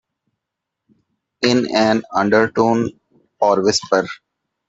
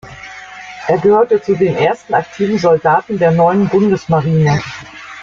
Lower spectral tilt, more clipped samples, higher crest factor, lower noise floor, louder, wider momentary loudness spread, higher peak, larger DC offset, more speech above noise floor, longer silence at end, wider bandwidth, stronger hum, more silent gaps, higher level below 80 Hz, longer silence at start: second, -4.5 dB/octave vs -7.5 dB/octave; neither; first, 18 dB vs 12 dB; first, -81 dBFS vs -32 dBFS; second, -17 LUFS vs -13 LUFS; second, 7 LU vs 19 LU; about the same, 0 dBFS vs -2 dBFS; neither; first, 65 dB vs 20 dB; first, 0.55 s vs 0 s; about the same, 8 kHz vs 7.6 kHz; neither; neither; second, -58 dBFS vs -48 dBFS; first, 1.4 s vs 0.05 s